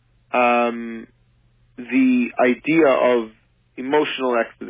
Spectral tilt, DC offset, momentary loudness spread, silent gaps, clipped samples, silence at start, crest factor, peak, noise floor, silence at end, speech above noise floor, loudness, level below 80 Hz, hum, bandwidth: -9 dB/octave; under 0.1%; 17 LU; none; under 0.1%; 0.35 s; 16 dB; -4 dBFS; -58 dBFS; 0 s; 40 dB; -19 LUFS; -62 dBFS; none; 3.8 kHz